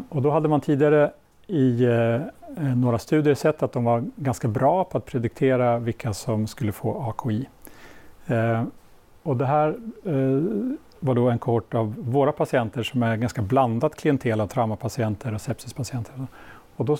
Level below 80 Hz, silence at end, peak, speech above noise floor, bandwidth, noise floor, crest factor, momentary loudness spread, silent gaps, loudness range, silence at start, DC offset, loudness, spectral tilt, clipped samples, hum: -56 dBFS; 0 s; -8 dBFS; 22 dB; 16.5 kHz; -45 dBFS; 16 dB; 11 LU; none; 5 LU; 0 s; under 0.1%; -24 LUFS; -7.5 dB/octave; under 0.1%; none